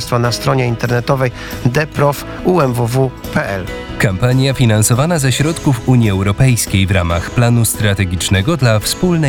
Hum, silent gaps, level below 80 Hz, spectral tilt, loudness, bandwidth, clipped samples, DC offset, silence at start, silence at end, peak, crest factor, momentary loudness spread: none; none; -32 dBFS; -5.5 dB/octave; -14 LUFS; 18 kHz; under 0.1%; under 0.1%; 0 s; 0 s; -2 dBFS; 12 dB; 5 LU